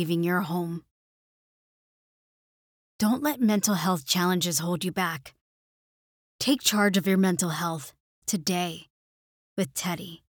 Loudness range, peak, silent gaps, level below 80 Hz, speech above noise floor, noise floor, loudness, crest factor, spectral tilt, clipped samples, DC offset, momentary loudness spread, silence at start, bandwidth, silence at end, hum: 4 LU; -8 dBFS; 0.91-2.99 s, 5.41-6.39 s, 8.00-8.22 s, 8.90-9.56 s; -70 dBFS; over 64 dB; under -90 dBFS; -26 LUFS; 22 dB; -4 dB/octave; under 0.1%; under 0.1%; 12 LU; 0 s; over 20 kHz; 0.15 s; none